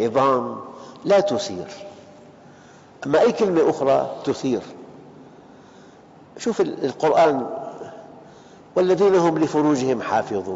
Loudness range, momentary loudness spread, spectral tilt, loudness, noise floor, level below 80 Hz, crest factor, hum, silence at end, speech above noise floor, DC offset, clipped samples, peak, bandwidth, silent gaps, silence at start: 4 LU; 20 LU; -5 dB/octave; -20 LUFS; -47 dBFS; -62 dBFS; 14 dB; none; 0 s; 28 dB; under 0.1%; under 0.1%; -6 dBFS; 8 kHz; none; 0 s